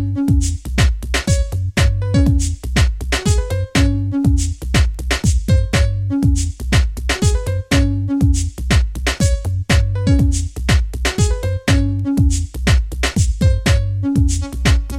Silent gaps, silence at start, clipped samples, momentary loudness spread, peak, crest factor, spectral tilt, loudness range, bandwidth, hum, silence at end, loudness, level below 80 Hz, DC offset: none; 0 s; under 0.1%; 4 LU; -2 dBFS; 14 dB; -5 dB/octave; 0 LU; 14.5 kHz; none; 0 s; -17 LUFS; -20 dBFS; under 0.1%